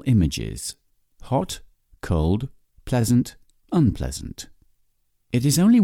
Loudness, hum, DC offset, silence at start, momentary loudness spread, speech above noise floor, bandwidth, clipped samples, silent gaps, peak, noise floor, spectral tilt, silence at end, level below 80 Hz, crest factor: -23 LUFS; none; under 0.1%; 0.05 s; 16 LU; 46 dB; 16.5 kHz; under 0.1%; none; -10 dBFS; -66 dBFS; -6 dB/octave; 0 s; -38 dBFS; 14 dB